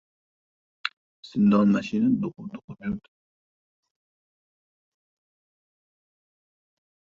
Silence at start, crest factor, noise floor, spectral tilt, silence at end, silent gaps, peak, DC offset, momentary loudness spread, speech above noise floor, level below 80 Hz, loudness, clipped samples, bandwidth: 0.85 s; 24 dB; under -90 dBFS; -7.5 dB/octave; 4.05 s; 0.93-1.23 s, 2.64-2.68 s; -6 dBFS; under 0.1%; 16 LU; over 67 dB; -64 dBFS; -25 LUFS; under 0.1%; 7.2 kHz